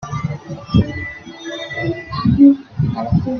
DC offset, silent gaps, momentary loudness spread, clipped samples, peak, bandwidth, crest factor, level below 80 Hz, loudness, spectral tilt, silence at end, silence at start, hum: under 0.1%; none; 18 LU; under 0.1%; 0 dBFS; 6.6 kHz; 16 dB; -38 dBFS; -17 LUFS; -8 dB/octave; 0 s; 0 s; none